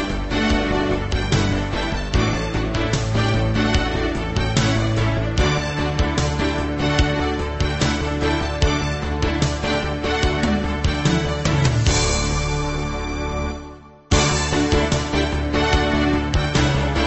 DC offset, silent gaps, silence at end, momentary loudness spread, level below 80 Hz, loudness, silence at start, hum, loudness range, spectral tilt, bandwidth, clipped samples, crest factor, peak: under 0.1%; none; 0 s; 5 LU; -26 dBFS; -20 LUFS; 0 s; none; 1 LU; -5 dB/octave; 8.6 kHz; under 0.1%; 16 dB; -4 dBFS